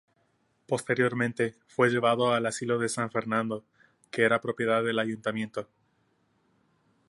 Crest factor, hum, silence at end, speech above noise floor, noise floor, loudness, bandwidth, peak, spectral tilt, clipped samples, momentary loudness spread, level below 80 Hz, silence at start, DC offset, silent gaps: 20 dB; none; 1.45 s; 43 dB; -71 dBFS; -28 LUFS; 11.5 kHz; -10 dBFS; -5 dB/octave; under 0.1%; 10 LU; -72 dBFS; 0.7 s; under 0.1%; none